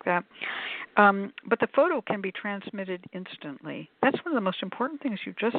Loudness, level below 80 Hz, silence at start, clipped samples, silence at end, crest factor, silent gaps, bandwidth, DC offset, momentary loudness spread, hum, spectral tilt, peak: -27 LUFS; -76 dBFS; 0.05 s; under 0.1%; 0 s; 24 dB; none; 4.6 kHz; under 0.1%; 17 LU; none; -9.5 dB/octave; -4 dBFS